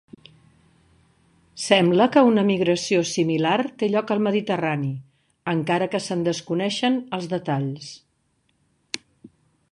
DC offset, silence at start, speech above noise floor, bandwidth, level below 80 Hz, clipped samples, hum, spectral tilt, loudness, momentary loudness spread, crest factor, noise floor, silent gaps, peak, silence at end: under 0.1%; 1.55 s; 47 dB; 11.5 kHz; -66 dBFS; under 0.1%; none; -5.5 dB/octave; -22 LUFS; 17 LU; 20 dB; -68 dBFS; none; -2 dBFS; 0.45 s